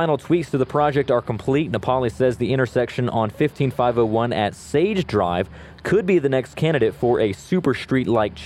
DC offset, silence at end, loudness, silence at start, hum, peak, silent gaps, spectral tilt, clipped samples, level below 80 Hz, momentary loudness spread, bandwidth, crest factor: under 0.1%; 0 s; -21 LUFS; 0 s; none; -4 dBFS; none; -7 dB/octave; under 0.1%; -46 dBFS; 4 LU; 13.5 kHz; 16 dB